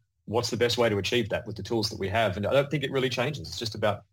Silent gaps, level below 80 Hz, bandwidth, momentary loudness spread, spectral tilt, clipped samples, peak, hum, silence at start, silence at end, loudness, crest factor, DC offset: none; -58 dBFS; 17 kHz; 7 LU; -5 dB/octave; under 0.1%; -12 dBFS; none; 0.3 s; 0.15 s; -27 LUFS; 16 dB; under 0.1%